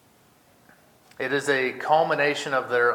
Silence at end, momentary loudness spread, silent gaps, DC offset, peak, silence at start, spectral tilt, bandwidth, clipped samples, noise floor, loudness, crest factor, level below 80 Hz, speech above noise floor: 0 s; 5 LU; none; under 0.1%; -6 dBFS; 1.2 s; -4 dB/octave; 17.5 kHz; under 0.1%; -58 dBFS; -23 LUFS; 18 dB; -74 dBFS; 35 dB